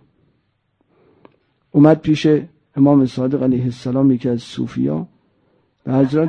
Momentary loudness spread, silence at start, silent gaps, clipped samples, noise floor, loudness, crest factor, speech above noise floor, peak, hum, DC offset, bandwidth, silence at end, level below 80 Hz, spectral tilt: 13 LU; 1.75 s; none; under 0.1%; -65 dBFS; -17 LUFS; 16 dB; 50 dB; -2 dBFS; none; under 0.1%; 8.6 kHz; 0 s; -54 dBFS; -8.5 dB/octave